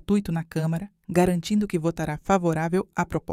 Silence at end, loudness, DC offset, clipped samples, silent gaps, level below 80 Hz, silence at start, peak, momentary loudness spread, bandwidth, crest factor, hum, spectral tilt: 0 s; -25 LUFS; under 0.1%; under 0.1%; none; -48 dBFS; 0.1 s; -6 dBFS; 6 LU; 15.5 kHz; 18 dB; none; -7 dB/octave